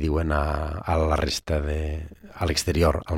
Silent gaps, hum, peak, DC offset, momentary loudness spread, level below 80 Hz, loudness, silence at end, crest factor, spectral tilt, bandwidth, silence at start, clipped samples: none; none; -6 dBFS; under 0.1%; 8 LU; -32 dBFS; -25 LUFS; 0 s; 18 dB; -5.5 dB/octave; 16 kHz; 0 s; under 0.1%